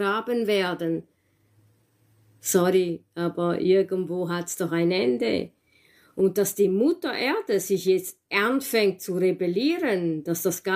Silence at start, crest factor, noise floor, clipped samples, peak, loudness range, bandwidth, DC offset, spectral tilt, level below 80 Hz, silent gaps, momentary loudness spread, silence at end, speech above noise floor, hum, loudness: 0 s; 18 dB; -64 dBFS; under 0.1%; -8 dBFS; 2 LU; 16 kHz; under 0.1%; -4.5 dB/octave; -68 dBFS; none; 7 LU; 0 s; 40 dB; none; -24 LUFS